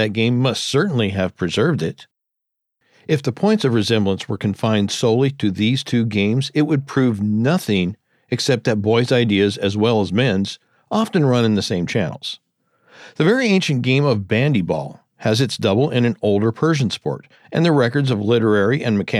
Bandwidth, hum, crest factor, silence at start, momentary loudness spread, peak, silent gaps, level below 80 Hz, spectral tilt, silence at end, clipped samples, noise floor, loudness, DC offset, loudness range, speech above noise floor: 13 kHz; none; 16 dB; 0 s; 8 LU; -4 dBFS; none; -58 dBFS; -6 dB/octave; 0 s; under 0.1%; -80 dBFS; -18 LUFS; under 0.1%; 3 LU; 62 dB